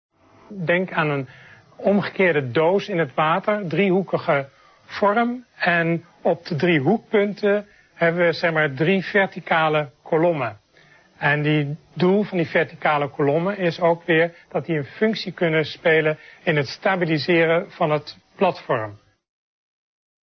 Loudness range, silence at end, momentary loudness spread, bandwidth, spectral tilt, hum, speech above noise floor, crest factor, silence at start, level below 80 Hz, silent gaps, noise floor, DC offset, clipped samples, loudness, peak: 2 LU; 1.3 s; 7 LU; 6.4 kHz; -7.5 dB/octave; none; 33 dB; 18 dB; 0.5 s; -64 dBFS; none; -54 dBFS; under 0.1%; under 0.1%; -21 LUFS; -4 dBFS